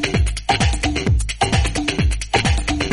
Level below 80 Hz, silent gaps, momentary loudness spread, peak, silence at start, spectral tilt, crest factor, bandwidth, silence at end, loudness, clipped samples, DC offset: -22 dBFS; none; 3 LU; -2 dBFS; 0 s; -4.5 dB/octave; 16 dB; 11.5 kHz; 0 s; -19 LUFS; under 0.1%; under 0.1%